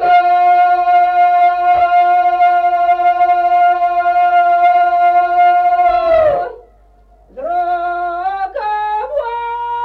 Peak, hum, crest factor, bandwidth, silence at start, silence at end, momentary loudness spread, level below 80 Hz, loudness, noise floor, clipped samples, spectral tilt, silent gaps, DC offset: -4 dBFS; none; 8 dB; 4.9 kHz; 0 s; 0 s; 9 LU; -46 dBFS; -12 LUFS; -46 dBFS; under 0.1%; -5 dB/octave; none; under 0.1%